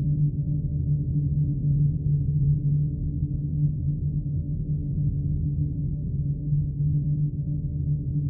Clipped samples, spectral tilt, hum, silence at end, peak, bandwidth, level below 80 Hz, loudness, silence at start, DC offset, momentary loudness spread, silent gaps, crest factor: under 0.1%; -21 dB/octave; none; 0 s; -14 dBFS; 0.8 kHz; -34 dBFS; -26 LUFS; 0 s; under 0.1%; 5 LU; none; 12 dB